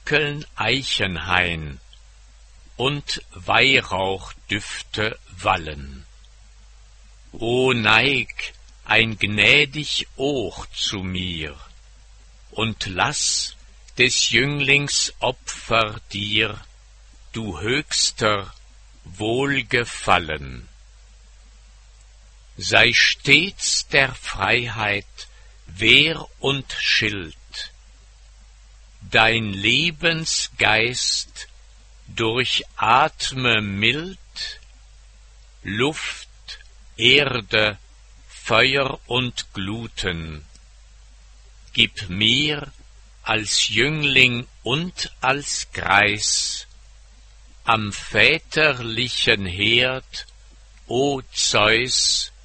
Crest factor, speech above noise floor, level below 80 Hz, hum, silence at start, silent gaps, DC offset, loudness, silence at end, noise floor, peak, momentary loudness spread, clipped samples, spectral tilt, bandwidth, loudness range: 22 dB; 26 dB; -44 dBFS; none; 0.05 s; none; under 0.1%; -19 LUFS; 0.15 s; -47 dBFS; 0 dBFS; 17 LU; under 0.1%; -2.5 dB/octave; 8.8 kHz; 6 LU